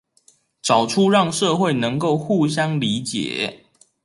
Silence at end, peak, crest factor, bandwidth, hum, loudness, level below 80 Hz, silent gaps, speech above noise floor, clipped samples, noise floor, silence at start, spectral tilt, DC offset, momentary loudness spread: 0.5 s; -4 dBFS; 16 dB; 11.5 kHz; none; -20 LUFS; -62 dBFS; none; 39 dB; under 0.1%; -58 dBFS; 0.65 s; -5 dB/octave; under 0.1%; 8 LU